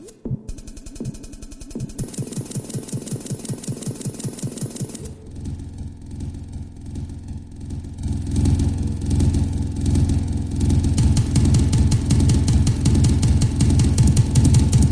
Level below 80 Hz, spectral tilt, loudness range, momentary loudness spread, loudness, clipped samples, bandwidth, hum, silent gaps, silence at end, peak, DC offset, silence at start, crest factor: -26 dBFS; -6.5 dB/octave; 14 LU; 18 LU; -20 LUFS; under 0.1%; 11 kHz; none; none; 0 s; -4 dBFS; under 0.1%; 0 s; 16 dB